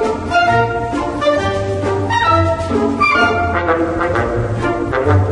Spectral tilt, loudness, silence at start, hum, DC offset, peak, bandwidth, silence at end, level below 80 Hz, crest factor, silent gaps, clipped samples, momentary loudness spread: -6.5 dB/octave; -15 LUFS; 0 s; none; under 0.1%; 0 dBFS; 10.5 kHz; 0 s; -34 dBFS; 14 dB; none; under 0.1%; 5 LU